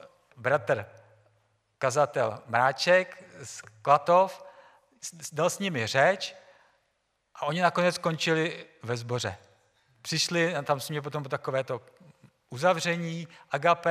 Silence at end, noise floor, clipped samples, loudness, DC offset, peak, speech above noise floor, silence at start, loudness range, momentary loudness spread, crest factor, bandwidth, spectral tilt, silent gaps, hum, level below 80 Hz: 0 s; -75 dBFS; under 0.1%; -27 LUFS; under 0.1%; -8 dBFS; 48 dB; 0.4 s; 5 LU; 17 LU; 22 dB; 15.5 kHz; -4 dB/octave; none; none; -76 dBFS